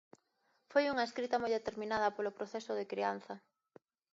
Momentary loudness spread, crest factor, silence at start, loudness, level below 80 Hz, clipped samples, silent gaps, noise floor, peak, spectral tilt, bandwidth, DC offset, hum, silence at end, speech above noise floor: 10 LU; 20 dB; 0.7 s; -37 LUFS; -76 dBFS; under 0.1%; none; -78 dBFS; -18 dBFS; -2 dB/octave; 7.6 kHz; under 0.1%; none; 0.75 s; 42 dB